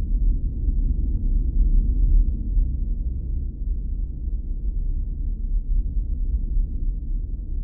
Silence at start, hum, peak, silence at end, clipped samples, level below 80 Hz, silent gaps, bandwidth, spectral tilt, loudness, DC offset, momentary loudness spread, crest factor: 0 s; none; -8 dBFS; 0 s; under 0.1%; -22 dBFS; none; 0.6 kHz; -15.5 dB/octave; -27 LUFS; under 0.1%; 8 LU; 12 dB